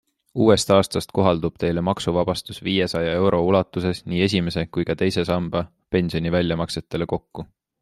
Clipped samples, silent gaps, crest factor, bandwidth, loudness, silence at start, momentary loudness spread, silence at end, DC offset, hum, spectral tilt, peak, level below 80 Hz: under 0.1%; none; 20 dB; 13 kHz; -22 LUFS; 0.35 s; 9 LU; 0.35 s; under 0.1%; none; -6 dB/octave; -2 dBFS; -48 dBFS